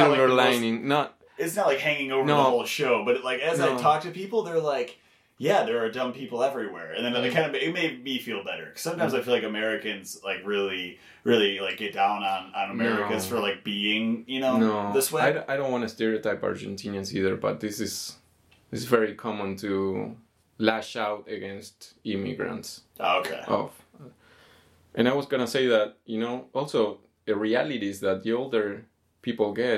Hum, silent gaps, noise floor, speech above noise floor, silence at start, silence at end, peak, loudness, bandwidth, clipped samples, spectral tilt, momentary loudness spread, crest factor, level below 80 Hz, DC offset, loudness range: none; none; -61 dBFS; 35 dB; 0 s; 0 s; -2 dBFS; -27 LUFS; 16.5 kHz; under 0.1%; -4.5 dB/octave; 11 LU; 24 dB; -72 dBFS; under 0.1%; 6 LU